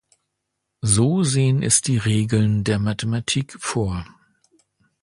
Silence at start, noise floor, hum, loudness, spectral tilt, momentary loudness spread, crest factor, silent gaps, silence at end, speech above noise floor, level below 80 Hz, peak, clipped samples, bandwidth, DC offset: 0.85 s; -78 dBFS; none; -20 LUFS; -4.5 dB/octave; 8 LU; 18 dB; none; 1 s; 58 dB; -44 dBFS; -2 dBFS; under 0.1%; 11.5 kHz; under 0.1%